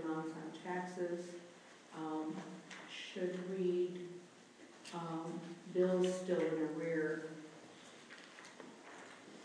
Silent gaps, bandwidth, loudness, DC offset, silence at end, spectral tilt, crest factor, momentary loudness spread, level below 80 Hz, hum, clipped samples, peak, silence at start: none; 10.5 kHz; -41 LUFS; under 0.1%; 0 s; -6 dB/octave; 18 dB; 19 LU; under -90 dBFS; none; under 0.1%; -24 dBFS; 0 s